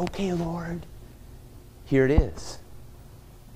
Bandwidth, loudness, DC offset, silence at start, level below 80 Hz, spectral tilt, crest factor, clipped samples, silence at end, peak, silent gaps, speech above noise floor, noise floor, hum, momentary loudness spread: 16 kHz; -26 LUFS; under 0.1%; 0 s; -34 dBFS; -7 dB/octave; 22 dB; under 0.1%; 0 s; -6 dBFS; none; 22 dB; -47 dBFS; none; 27 LU